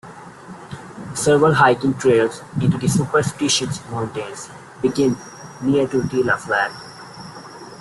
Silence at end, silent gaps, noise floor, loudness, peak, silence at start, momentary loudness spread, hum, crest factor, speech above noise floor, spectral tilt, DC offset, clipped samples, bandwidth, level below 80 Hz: 0.05 s; none; -38 dBFS; -19 LUFS; -2 dBFS; 0.05 s; 21 LU; none; 18 dB; 20 dB; -5 dB/octave; under 0.1%; under 0.1%; 12.5 kHz; -52 dBFS